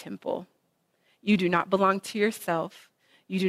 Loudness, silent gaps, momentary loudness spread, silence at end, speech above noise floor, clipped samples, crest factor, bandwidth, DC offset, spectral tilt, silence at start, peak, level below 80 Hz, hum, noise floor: -27 LUFS; none; 12 LU; 0 s; 46 dB; under 0.1%; 20 dB; 15.5 kHz; under 0.1%; -5.5 dB/octave; 0 s; -8 dBFS; -70 dBFS; none; -72 dBFS